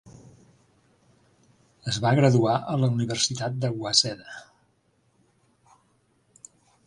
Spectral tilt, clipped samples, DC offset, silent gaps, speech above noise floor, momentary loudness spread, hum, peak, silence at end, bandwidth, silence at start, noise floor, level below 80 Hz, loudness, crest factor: -4.5 dB/octave; under 0.1%; under 0.1%; none; 44 dB; 18 LU; none; -4 dBFS; 2.45 s; 11.5 kHz; 0.05 s; -67 dBFS; -62 dBFS; -24 LUFS; 24 dB